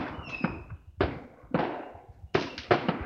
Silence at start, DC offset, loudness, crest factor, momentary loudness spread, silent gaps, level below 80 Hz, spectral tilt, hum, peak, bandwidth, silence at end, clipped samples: 0 s; under 0.1%; -32 LUFS; 26 dB; 18 LU; none; -50 dBFS; -7 dB/octave; none; -6 dBFS; 7.2 kHz; 0 s; under 0.1%